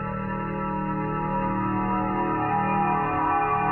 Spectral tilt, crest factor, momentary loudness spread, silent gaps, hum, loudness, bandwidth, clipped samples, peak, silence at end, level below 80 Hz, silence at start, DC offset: -10.5 dB/octave; 14 dB; 5 LU; none; none; -25 LUFS; 4 kHz; under 0.1%; -12 dBFS; 0 s; -44 dBFS; 0 s; under 0.1%